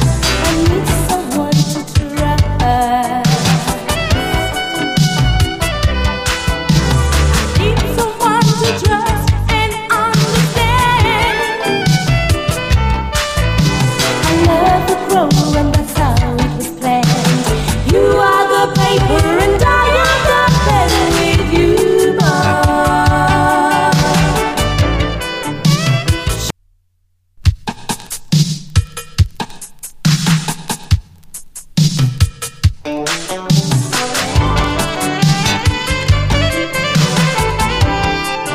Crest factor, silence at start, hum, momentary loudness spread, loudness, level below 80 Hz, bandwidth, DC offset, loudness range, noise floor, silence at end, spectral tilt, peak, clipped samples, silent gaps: 14 dB; 0 s; none; 7 LU; -13 LUFS; -22 dBFS; 15.5 kHz; under 0.1%; 6 LU; -59 dBFS; 0 s; -5 dB/octave; 0 dBFS; under 0.1%; none